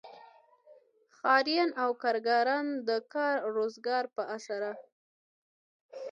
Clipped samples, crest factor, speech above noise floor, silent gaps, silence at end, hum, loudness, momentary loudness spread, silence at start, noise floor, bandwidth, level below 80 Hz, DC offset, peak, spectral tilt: under 0.1%; 20 dB; 33 dB; 4.92-5.89 s; 0 s; none; -30 LUFS; 11 LU; 0.05 s; -64 dBFS; 8.8 kHz; -88 dBFS; under 0.1%; -12 dBFS; -3.5 dB/octave